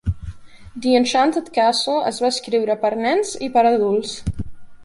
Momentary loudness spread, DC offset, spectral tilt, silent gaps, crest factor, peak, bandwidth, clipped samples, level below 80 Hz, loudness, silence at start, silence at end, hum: 15 LU; under 0.1%; -4.5 dB/octave; none; 16 dB; -4 dBFS; 11.5 kHz; under 0.1%; -38 dBFS; -19 LUFS; 0.05 s; 0 s; none